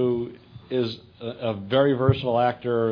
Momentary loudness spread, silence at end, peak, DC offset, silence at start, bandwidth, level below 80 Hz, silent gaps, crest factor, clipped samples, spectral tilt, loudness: 13 LU; 0 s; -4 dBFS; under 0.1%; 0 s; 5.4 kHz; -50 dBFS; none; 20 dB; under 0.1%; -9 dB/octave; -24 LUFS